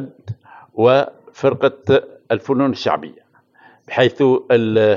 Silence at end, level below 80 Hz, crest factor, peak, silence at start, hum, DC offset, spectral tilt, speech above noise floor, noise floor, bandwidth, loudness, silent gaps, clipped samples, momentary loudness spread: 0 s; -68 dBFS; 18 dB; 0 dBFS; 0 s; none; under 0.1%; -7 dB/octave; 36 dB; -51 dBFS; 7.2 kHz; -17 LUFS; none; under 0.1%; 18 LU